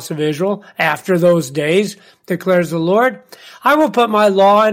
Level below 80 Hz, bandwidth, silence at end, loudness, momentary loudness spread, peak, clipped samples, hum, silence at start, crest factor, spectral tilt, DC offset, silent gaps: -64 dBFS; 16.5 kHz; 0 s; -15 LUFS; 9 LU; -2 dBFS; under 0.1%; none; 0 s; 12 dB; -5.5 dB/octave; under 0.1%; none